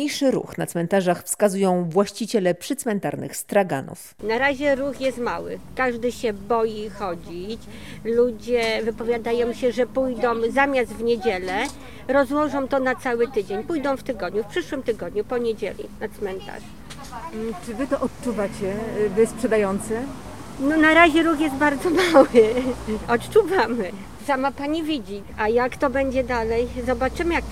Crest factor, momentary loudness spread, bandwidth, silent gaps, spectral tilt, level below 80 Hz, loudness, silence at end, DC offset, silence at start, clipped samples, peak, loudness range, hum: 22 dB; 12 LU; 16.5 kHz; none; -5 dB/octave; -44 dBFS; -22 LUFS; 0 s; 0.7%; 0 s; under 0.1%; 0 dBFS; 9 LU; none